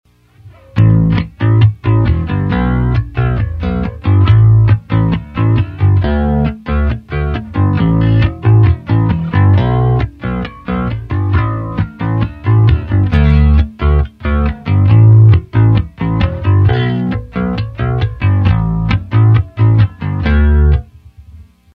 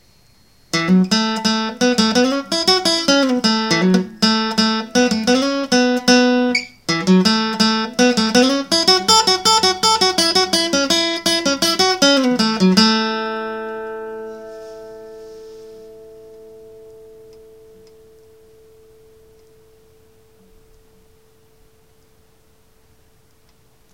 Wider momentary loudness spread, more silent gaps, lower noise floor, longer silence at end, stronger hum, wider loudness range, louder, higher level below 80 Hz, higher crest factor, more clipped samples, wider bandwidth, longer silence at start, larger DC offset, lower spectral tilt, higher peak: second, 9 LU vs 16 LU; neither; second, -41 dBFS vs -55 dBFS; second, 0.35 s vs 7.05 s; neither; second, 4 LU vs 9 LU; about the same, -13 LUFS vs -15 LUFS; first, -20 dBFS vs -54 dBFS; second, 12 dB vs 18 dB; neither; second, 4.7 kHz vs 17 kHz; second, 0.45 s vs 0.75 s; second, under 0.1% vs 0.2%; first, -10 dB/octave vs -3.5 dB/octave; about the same, 0 dBFS vs 0 dBFS